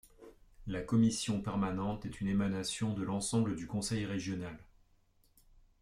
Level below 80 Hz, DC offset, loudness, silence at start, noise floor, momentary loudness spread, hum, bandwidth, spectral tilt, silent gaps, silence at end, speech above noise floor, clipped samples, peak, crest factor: -56 dBFS; under 0.1%; -35 LUFS; 0.2 s; -69 dBFS; 12 LU; none; 14.5 kHz; -5.5 dB/octave; none; 1.2 s; 35 dB; under 0.1%; -18 dBFS; 16 dB